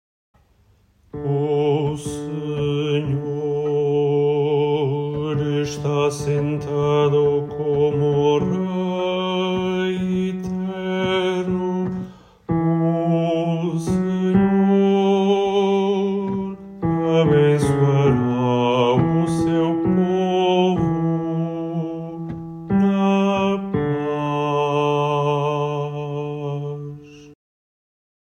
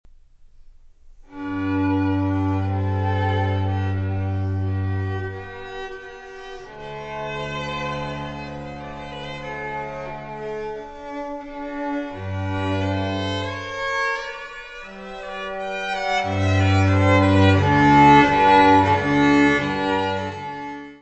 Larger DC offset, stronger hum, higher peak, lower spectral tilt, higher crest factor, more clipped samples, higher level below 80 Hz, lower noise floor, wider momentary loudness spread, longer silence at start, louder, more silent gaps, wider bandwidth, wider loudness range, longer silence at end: second, under 0.1% vs 0.1%; neither; about the same, -4 dBFS vs -2 dBFS; about the same, -7.5 dB/octave vs -7 dB/octave; about the same, 16 dB vs 20 dB; neither; about the same, -48 dBFS vs -46 dBFS; first, -57 dBFS vs -48 dBFS; second, 10 LU vs 19 LU; first, 1.15 s vs 0.55 s; about the same, -20 LUFS vs -21 LUFS; neither; first, 10.5 kHz vs 8.2 kHz; second, 4 LU vs 15 LU; first, 0.9 s vs 0.05 s